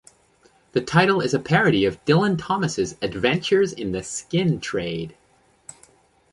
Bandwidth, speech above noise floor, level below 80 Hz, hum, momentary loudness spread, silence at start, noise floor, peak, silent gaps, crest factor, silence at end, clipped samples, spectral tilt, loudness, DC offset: 11.5 kHz; 39 dB; -52 dBFS; none; 10 LU; 0.75 s; -60 dBFS; -4 dBFS; none; 18 dB; 1.2 s; under 0.1%; -5.5 dB/octave; -22 LUFS; under 0.1%